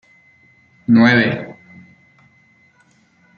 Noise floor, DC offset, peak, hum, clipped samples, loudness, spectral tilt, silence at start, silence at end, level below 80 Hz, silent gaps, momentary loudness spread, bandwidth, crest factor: -56 dBFS; under 0.1%; -2 dBFS; none; under 0.1%; -14 LUFS; -7 dB/octave; 0.9 s; 1.85 s; -60 dBFS; none; 20 LU; 6.6 kHz; 18 dB